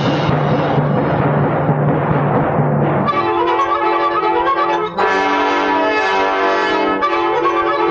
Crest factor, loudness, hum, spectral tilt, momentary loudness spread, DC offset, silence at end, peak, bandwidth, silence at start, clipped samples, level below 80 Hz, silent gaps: 12 dB; -15 LUFS; none; -7 dB/octave; 1 LU; under 0.1%; 0 s; -2 dBFS; 7.4 kHz; 0 s; under 0.1%; -44 dBFS; none